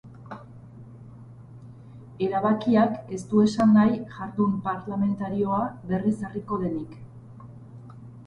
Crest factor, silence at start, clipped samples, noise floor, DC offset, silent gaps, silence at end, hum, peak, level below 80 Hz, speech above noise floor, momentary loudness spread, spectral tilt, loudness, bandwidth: 16 dB; 0.05 s; under 0.1%; -45 dBFS; under 0.1%; none; 0 s; none; -10 dBFS; -58 dBFS; 21 dB; 26 LU; -8 dB/octave; -25 LUFS; 9.6 kHz